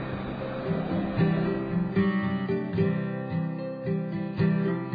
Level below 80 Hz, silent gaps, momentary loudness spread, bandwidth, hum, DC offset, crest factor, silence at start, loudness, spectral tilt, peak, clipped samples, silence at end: -52 dBFS; none; 7 LU; 5 kHz; none; under 0.1%; 14 dB; 0 s; -28 LUFS; -11 dB/octave; -12 dBFS; under 0.1%; 0 s